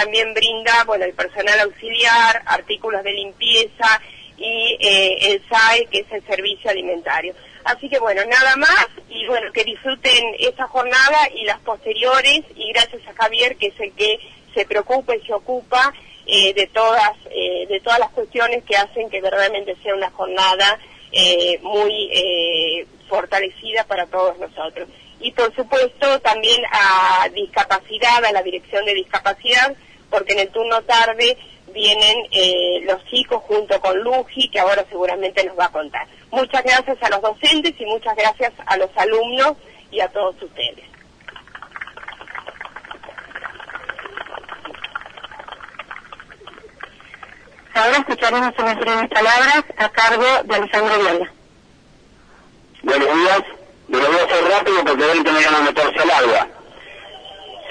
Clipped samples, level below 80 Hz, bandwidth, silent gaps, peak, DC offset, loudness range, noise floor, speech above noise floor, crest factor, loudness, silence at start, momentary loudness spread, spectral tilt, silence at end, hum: under 0.1%; -52 dBFS; 10.5 kHz; none; -4 dBFS; under 0.1%; 9 LU; -49 dBFS; 32 dB; 14 dB; -16 LUFS; 0 s; 18 LU; -1.5 dB/octave; 0 s; none